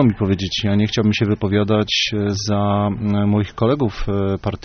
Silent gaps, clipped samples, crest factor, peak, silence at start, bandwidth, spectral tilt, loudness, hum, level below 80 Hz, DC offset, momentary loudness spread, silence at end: none; under 0.1%; 16 dB; -2 dBFS; 0 s; 6.6 kHz; -5.5 dB/octave; -19 LUFS; none; -38 dBFS; under 0.1%; 4 LU; 0.05 s